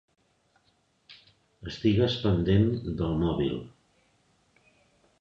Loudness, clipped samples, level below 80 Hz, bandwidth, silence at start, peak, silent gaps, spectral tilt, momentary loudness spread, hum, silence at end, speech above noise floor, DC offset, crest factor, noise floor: -27 LUFS; under 0.1%; -46 dBFS; 7.2 kHz; 1.1 s; -10 dBFS; none; -8 dB/octave; 13 LU; none; 1.5 s; 44 dB; under 0.1%; 20 dB; -69 dBFS